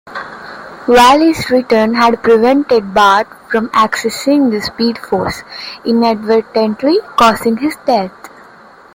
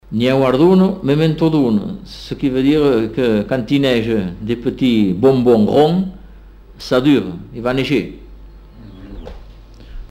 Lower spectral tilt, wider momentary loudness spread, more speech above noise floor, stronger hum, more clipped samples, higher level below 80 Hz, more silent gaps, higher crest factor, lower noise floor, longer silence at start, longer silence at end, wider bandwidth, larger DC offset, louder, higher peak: second, -4.5 dB/octave vs -7.5 dB/octave; about the same, 14 LU vs 16 LU; about the same, 28 dB vs 25 dB; neither; neither; second, -46 dBFS vs -38 dBFS; neither; about the same, 12 dB vs 14 dB; about the same, -40 dBFS vs -39 dBFS; about the same, 0.05 s vs 0.1 s; first, 0.7 s vs 0.05 s; about the same, 17 kHz vs 16 kHz; neither; first, -12 LUFS vs -15 LUFS; about the same, 0 dBFS vs -2 dBFS